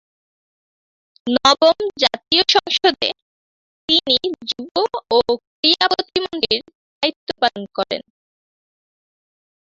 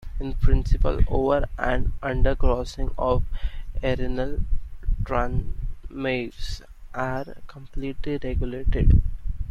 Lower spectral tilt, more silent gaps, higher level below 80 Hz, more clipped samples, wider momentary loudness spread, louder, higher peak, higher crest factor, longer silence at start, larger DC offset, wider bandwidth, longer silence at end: second, -2.5 dB/octave vs -7.5 dB/octave; first, 3.22-3.88 s, 4.71-4.75 s, 5.47-5.63 s, 6.75-7.01 s, 7.16-7.27 s vs none; second, -58 dBFS vs -26 dBFS; neither; about the same, 11 LU vs 13 LU; first, -17 LUFS vs -27 LUFS; first, 0 dBFS vs -4 dBFS; about the same, 20 dB vs 18 dB; first, 1.25 s vs 0 s; neither; about the same, 7.8 kHz vs 7.2 kHz; first, 1.75 s vs 0 s